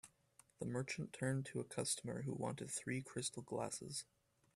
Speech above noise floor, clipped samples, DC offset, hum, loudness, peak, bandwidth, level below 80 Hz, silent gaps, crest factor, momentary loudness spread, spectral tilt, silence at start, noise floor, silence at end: 28 dB; under 0.1%; under 0.1%; none; -44 LUFS; -26 dBFS; 14.5 kHz; -76 dBFS; none; 20 dB; 7 LU; -4 dB/octave; 0.05 s; -72 dBFS; 0.55 s